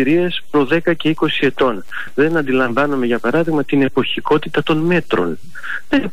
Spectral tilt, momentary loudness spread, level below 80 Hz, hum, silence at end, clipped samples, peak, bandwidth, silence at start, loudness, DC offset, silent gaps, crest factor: -7 dB/octave; 5 LU; -48 dBFS; none; 0 s; under 0.1%; -6 dBFS; 15 kHz; 0 s; -17 LUFS; 6%; none; 12 dB